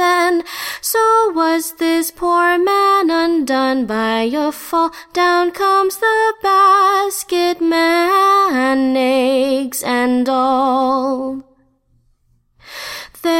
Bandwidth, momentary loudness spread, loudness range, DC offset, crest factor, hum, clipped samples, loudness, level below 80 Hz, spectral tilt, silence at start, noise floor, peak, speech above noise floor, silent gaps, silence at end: 16.5 kHz; 8 LU; 4 LU; under 0.1%; 12 dB; none; under 0.1%; -15 LUFS; -54 dBFS; -2.5 dB/octave; 0 s; -58 dBFS; -2 dBFS; 43 dB; none; 0 s